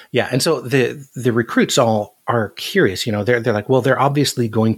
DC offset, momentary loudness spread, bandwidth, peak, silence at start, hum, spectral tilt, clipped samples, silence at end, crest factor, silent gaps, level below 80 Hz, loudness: under 0.1%; 6 LU; 17.5 kHz; 0 dBFS; 0 s; none; -5 dB/octave; under 0.1%; 0 s; 16 dB; none; -62 dBFS; -17 LUFS